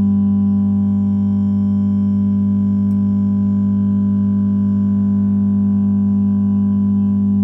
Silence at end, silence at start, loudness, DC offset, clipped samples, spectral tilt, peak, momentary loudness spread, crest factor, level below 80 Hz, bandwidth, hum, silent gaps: 0 s; 0 s; -16 LUFS; under 0.1%; under 0.1%; -12.5 dB/octave; -8 dBFS; 1 LU; 6 dB; -48 dBFS; 1.7 kHz; none; none